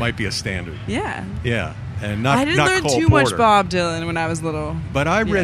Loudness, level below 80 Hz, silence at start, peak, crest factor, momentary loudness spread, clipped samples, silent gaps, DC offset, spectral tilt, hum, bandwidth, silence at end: -19 LUFS; -36 dBFS; 0 s; 0 dBFS; 18 dB; 11 LU; under 0.1%; none; under 0.1%; -5 dB/octave; none; 14.5 kHz; 0 s